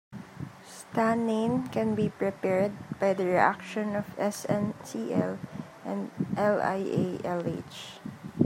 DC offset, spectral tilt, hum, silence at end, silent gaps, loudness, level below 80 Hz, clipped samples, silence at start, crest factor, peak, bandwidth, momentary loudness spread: under 0.1%; -6.5 dB/octave; none; 0 s; none; -29 LUFS; -66 dBFS; under 0.1%; 0.1 s; 22 dB; -8 dBFS; 16 kHz; 15 LU